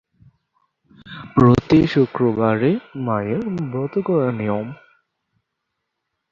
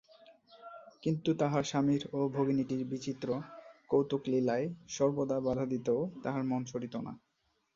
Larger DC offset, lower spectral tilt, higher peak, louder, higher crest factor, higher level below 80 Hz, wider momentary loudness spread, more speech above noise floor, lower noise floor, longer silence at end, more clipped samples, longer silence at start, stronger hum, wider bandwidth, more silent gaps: neither; first, -9 dB/octave vs -6.5 dB/octave; first, -2 dBFS vs -16 dBFS; first, -19 LUFS vs -33 LUFS; about the same, 18 dB vs 18 dB; first, -46 dBFS vs -68 dBFS; about the same, 11 LU vs 13 LU; first, 60 dB vs 28 dB; first, -78 dBFS vs -60 dBFS; first, 1.55 s vs 0.6 s; neither; first, 1.05 s vs 0.3 s; neither; about the same, 7.4 kHz vs 7.6 kHz; neither